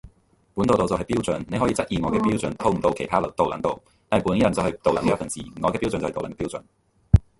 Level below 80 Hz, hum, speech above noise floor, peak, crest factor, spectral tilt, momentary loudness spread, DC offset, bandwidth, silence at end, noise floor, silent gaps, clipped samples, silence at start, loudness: -36 dBFS; none; 36 dB; 0 dBFS; 22 dB; -6.5 dB/octave; 9 LU; under 0.1%; 11.5 kHz; 0.2 s; -59 dBFS; none; under 0.1%; 0.05 s; -24 LUFS